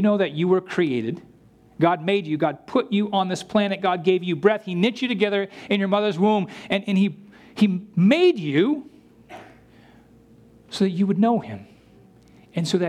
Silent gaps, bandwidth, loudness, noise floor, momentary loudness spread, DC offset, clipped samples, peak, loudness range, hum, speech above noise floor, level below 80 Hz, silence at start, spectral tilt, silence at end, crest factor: none; 10.5 kHz; -22 LUFS; -53 dBFS; 7 LU; under 0.1%; under 0.1%; -4 dBFS; 5 LU; none; 31 dB; -66 dBFS; 0 s; -6.5 dB/octave; 0 s; 18 dB